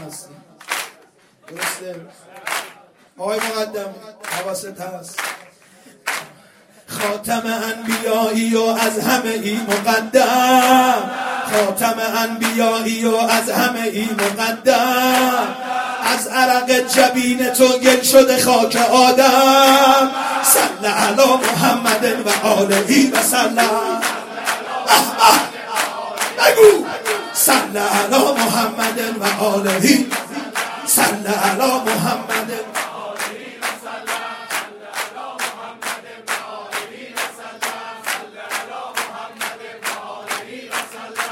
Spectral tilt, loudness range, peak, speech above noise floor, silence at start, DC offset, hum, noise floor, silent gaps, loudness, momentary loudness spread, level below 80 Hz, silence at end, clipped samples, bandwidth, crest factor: -2.5 dB/octave; 14 LU; 0 dBFS; 36 dB; 0 s; under 0.1%; none; -51 dBFS; none; -16 LUFS; 15 LU; -62 dBFS; 0 s; under 0.1%; 16.5 kHz; 18 dB